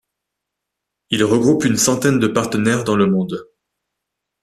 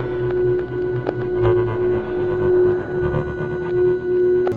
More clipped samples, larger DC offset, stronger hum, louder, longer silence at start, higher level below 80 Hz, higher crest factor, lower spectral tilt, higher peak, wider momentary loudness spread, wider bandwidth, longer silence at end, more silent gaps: neither; neither; neither; first, -16 LUFS vs -20 LUFS; first, 1.1 s vs 0 s; second, -54 dBFS vs -40 dBFS; about the same, 18 dB vs 16 dB; second, -4.5 dB/octave vs -10 dB/octave; about the same, -2 dBFS vs -4 dBFS; about the same, 7 LU vs 6 LU; first, 14.5 kHz vs 4.3 kHz; first, 1 s vs 0 s; neither